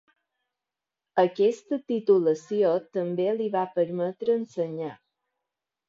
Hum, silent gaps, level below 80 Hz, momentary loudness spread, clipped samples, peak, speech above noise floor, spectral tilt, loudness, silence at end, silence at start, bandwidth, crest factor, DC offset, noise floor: none; none; -78 dBFS; 9 LU; under 0.1%; -8 dBFS; 64 dB; -7 dB/octave; -26 LUFS; 0.95 s; 1.15 s; 7.6 kHz; 18 dB; under 0.1%; -89 dBFS